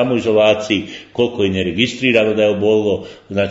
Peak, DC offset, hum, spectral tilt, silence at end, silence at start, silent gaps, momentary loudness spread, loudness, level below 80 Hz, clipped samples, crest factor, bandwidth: 0 dBFS; under 0.1%; none; -5.5 dB/octave; 0 s; 0 s; none; 7 LU; -16 LUFS; -54 dBFS; under 0.1%; 16 dB; 8 kHz